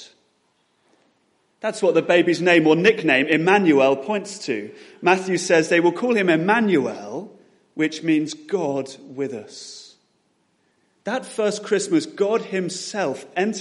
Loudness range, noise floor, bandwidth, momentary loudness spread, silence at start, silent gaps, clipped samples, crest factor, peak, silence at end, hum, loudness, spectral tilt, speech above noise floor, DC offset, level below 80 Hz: 9 LU; -66 dBFS; 11.5 kHz; 16 LU; 0 s; none; under 0.1%; 20 dB; -2 dBFS; 0 s; none; -20 LUFS; -4.5 dB/octave; 46 dB; under 0.1%; -70 dBFS